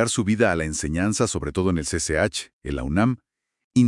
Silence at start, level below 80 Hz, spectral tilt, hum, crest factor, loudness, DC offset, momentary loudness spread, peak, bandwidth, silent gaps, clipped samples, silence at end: 0 s; -40 dBFS; -5 dB/octave; none; 18 dB; -23 LUFS; under 0.1%; 9 LU; -4 dBFS; 12 kHz; 2.53-2.61 s, 3.64-3.71 s; under 0.1%; 0 s